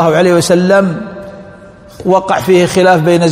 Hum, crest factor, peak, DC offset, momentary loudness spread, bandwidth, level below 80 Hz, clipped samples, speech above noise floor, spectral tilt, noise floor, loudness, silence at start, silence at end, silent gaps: none; 10 dB; 0 dBFS; under 0.1%; 16 LU; 16 kHz; -46 dBFS; 0.4%; 26 dB; -5.5 dB/octave; -35 dBFS; -10 LUFS; 0 s; 0 s; none